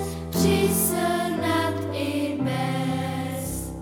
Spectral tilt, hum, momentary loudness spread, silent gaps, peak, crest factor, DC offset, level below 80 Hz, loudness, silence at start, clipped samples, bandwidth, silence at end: -5 dB/octave; none; 8 LU; none; -8 dBFS; 16 dB; under 0.1%; -44 dBFS; -25 LUFS; 0 s; under 0.1%; 19 kHz; 0 s